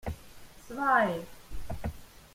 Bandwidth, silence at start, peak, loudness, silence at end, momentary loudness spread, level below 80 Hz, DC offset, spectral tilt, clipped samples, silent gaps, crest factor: 16.5 kHz; 0.05 s; -12 dBFS; -30 LUFS; 0.1 s; 22 LU; -48 dBFS; under 0.1%; -6 dB/octave; under 0.1%; none; 22 dB